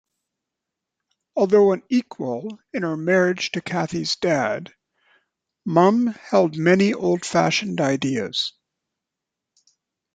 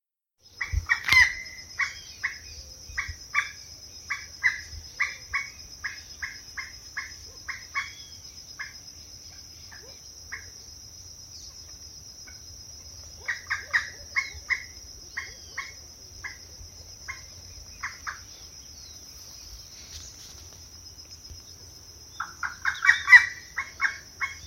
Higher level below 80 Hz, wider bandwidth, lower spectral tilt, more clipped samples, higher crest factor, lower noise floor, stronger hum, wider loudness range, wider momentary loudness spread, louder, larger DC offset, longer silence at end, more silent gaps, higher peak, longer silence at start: second, -64 dBFS vs -48 dBFS; second, 9.2 kHz vs 16.5 kHz; first, -5 dB/octave vs -0.5 dB/octave; neither; second, 20 dB vs 30 dB; first, -85 dBFS vs -62 dBFS; neither; second, 4 LU vs 20 LU; second, 11 LU vs 17 LU; first, -21 LUFS vs -26 LUFS; neither; first, 1.65 s vs 0 s; neither; about the same, -2 dBFS vs 0 dBFS; first, 1.35 s vs 0.55 s